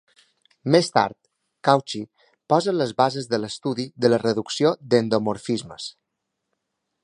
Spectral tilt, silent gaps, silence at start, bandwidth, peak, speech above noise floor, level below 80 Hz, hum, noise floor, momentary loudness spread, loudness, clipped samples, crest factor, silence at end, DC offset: -5.5 dB/octave; none; 0.65 s; 11 kHz; 0 dBFS; 58 dB; -66 dBFS; none; -80 dBFS; 13 LU; -22 LUFS; under 0.1%; 22 dB; 1.15 s; under 0.1%